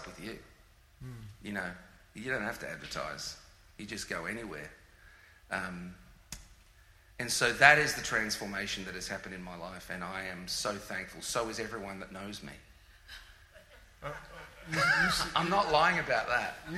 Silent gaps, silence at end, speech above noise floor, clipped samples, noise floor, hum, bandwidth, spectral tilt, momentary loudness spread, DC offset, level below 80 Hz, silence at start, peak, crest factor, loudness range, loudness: none; 0 s; 27 dB; under 0.1%; -60 dBFS; none; 16 kHz; -3 dB/octave; 23 LU; under 0.1%; -58 dBFS; 0 s; -6 dBFS; 30 dB; 13 LU; -31 LUFS